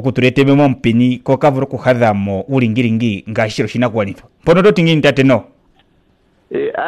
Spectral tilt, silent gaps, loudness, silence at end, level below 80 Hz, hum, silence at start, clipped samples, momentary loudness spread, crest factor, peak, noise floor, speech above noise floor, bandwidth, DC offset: -7 dB/octave; none; -14 LUFS; 0 s; -46 dBFS; none; 0 s; under 0.1%; 8 LU; 12 dB; -2 dBFS; -55 dBFS; 42 dB; 12 kHz; under 0.1%